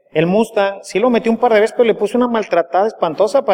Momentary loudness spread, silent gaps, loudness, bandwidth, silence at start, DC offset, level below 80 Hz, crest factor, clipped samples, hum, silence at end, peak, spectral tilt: 4 LU; none; -15 LUFS; 15 kHz; 0.15 s; under 0.1%; -60 dBFS; 14 dB; under 0.1%; none; 0 s; -2 dBFS; -6 dB/octave